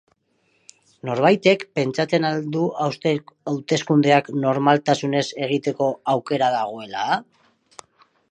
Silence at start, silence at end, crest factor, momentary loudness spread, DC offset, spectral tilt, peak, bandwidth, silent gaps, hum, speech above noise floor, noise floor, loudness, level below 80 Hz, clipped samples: 1.05 s; 1.1 s; 20 dB; 10 LU; under 0.1%; -5.5 dB/octave; -2 dBFS; 9.8 kHz; none; none; 46 dB; -66 dBFS; -21 LUFS; -70 dBFS; under 0.1%